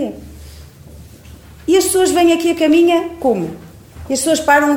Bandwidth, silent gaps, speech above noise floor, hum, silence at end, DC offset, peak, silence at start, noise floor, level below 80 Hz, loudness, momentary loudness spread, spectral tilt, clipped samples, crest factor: 18.5 kHz; none; 25 dB; none; 0 s; under 0.1%; 0 dBFS; 0 s; -38 dBFS; -42 dBFS; -14 LUFS; 15 LU; -3.5 dB/octave; under 0.1%; 14 dB